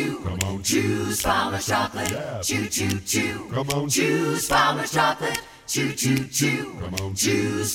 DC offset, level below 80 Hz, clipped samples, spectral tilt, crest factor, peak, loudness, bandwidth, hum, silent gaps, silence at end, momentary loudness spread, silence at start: under 0.1%; -48 dBFS; under 0.1%; -3.5 dB/octave; 20 dB; -4 dBFS; -23 LUFS; 19.5 kHz; none; none; 0 s; 7 LU; 0 s